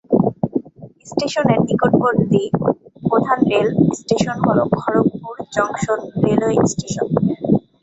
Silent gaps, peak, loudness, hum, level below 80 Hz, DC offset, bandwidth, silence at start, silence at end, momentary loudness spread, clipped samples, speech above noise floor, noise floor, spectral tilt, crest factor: none; 0 dBFS; -18 LUFS; none; -48 dBFS; under 0.1%; 8.2 kHz; 0.1 s; 0.25 s; 8 LU; under 0.1%; 22 dB; -38 dBFS; -6.5 dB/octave; 18 dB